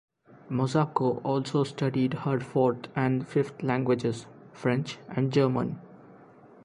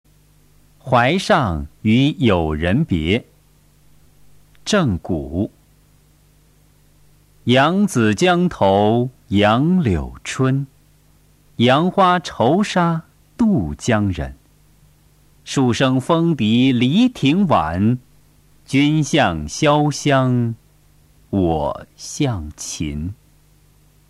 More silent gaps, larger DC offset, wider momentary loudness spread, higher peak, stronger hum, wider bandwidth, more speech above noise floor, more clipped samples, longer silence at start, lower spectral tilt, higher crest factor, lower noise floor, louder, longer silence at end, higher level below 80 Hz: neither; neither; second, 8 LU vs 11 LU; second, -10 dBFS vs 0 dBFS; second, none vs 50 Hz at -50 dBFS; second, 11 kHz vs 13.5 kHz; second, 26 dB vs 37 dB; neither; second, 0.5 s vs 0.85 s; first, -7.5 dB/octave vs -6 dB/octave; about the same, 18 dB vs 18 dB; about the same, -53 dBFS vs -53 dBFS; second, -28 LUFS vs -18 LUFS; second, 0.5 s vs 0.95 s; second, -64 dBFS vs -40 dBFS